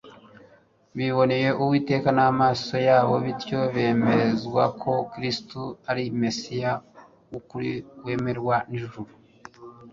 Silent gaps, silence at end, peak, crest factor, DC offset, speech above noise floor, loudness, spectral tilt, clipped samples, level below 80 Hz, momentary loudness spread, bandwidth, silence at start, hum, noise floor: none; 0 s; -6 dBFS; 18 dB; under 0.1%; 34 dB; -24 LUFS; -6.5 dB/octave; under 0.1%; -58 dBFS; 15 LU; 7.6 kHz; 0.05 s; none; -57 dBFS